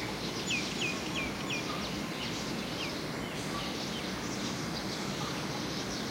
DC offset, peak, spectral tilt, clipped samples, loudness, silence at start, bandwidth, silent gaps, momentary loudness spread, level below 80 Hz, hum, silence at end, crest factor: under 0.1%; -22 dBFS; -3.5 dB/octave; under 0.1%; -35 LUFS; 0 s; 16 kHz; none; 3 LU; -54 dBFS; none; 0 s; 14 dB